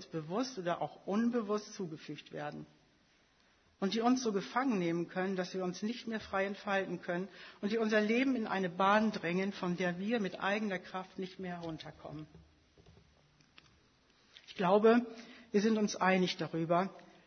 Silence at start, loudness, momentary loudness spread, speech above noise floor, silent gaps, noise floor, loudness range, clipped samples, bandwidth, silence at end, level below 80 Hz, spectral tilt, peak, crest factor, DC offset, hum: 0 s; -34 LUFS; 15 LU; 35 dB; none; -70 dBFS; 9 LU; under 0.1%; 6.4 kHz; 0.2 s; -74 dBFS; -4.5 dB/octave; -14 dBFS; 20 dB; under 0.1%; none